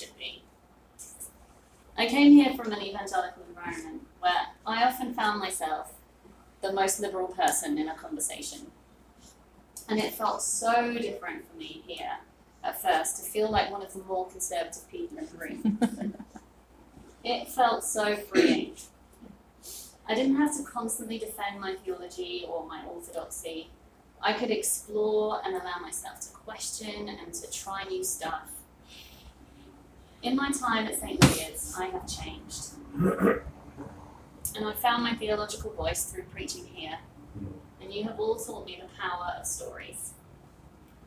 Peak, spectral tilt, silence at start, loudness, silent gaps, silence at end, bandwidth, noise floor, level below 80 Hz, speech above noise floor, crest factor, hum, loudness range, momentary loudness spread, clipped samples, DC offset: -4 dBFS; -4 dB/octave; 0 s; -30 LUFS; none; 0.2 s; 16 kHz; -59 dBFS; -54 dBFS; 29 dB; 26 dB; none; 10 LU; 17 LU; under 0.1%; under 0.1%